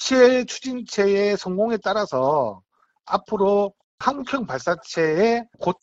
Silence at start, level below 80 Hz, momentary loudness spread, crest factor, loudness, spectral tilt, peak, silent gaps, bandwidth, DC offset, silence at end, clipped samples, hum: 0 s; -58 dBFS; 9 LU; 18 dB; -22 LUFS; -4.5 dB/octave; -4 dBFS; 3.84-3.98 s; 8 kHz; under 0.1%; 0.1 s; under 0.1%; none